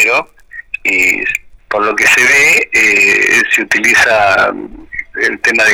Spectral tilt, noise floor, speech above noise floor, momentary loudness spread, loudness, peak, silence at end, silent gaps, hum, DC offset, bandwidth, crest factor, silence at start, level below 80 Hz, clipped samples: -1.5 dB/octave; -33 dBFS; 23 dB; 16 LU; -9 LUFS; -2 dBFS; 0 s; none; none; under 0.1%; over 20 kHz; 8 dB; 0 s; -44 dBFS; under 0.1%